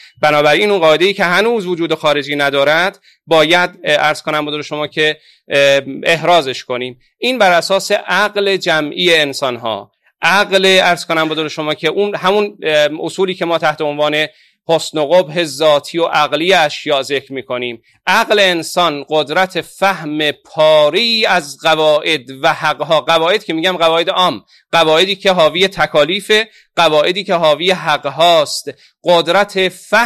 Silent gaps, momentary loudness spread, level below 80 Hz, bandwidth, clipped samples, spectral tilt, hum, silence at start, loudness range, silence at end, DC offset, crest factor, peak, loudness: none; 8 LU; -58 dBFS; 15 kHz; under 0.1%; -3.5 dB/octave; none; 0.2 s; 2 LU; 0 s; 0.2%; 14 dB; 0 dBFS; -13 LUFS